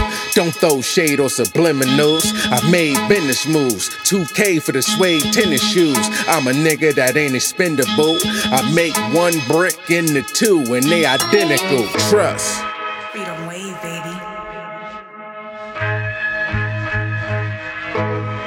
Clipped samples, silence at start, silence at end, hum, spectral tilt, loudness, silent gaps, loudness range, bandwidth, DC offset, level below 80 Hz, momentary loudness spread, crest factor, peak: under 0.1%; 0 s; 0 s; none; -3.5 dB/octave; -16 LUFS; none; 9 LU; 18 kHz; under 0.1%; -48 dBFS; 13 LU; 16 dB; 0 dBFS